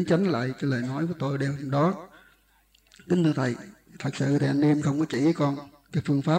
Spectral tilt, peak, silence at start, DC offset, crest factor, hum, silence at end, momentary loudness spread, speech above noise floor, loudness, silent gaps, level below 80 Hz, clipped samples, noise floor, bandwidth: -7.5 dB/octave; -10 dBFS; 0 s; under 0.1%; 16 dB; none; 0 s; 10 LU; 38 dB; -26 LUFS; none; -64 dBFS; under 0.1%; -63 dBFS; 9.6 kHz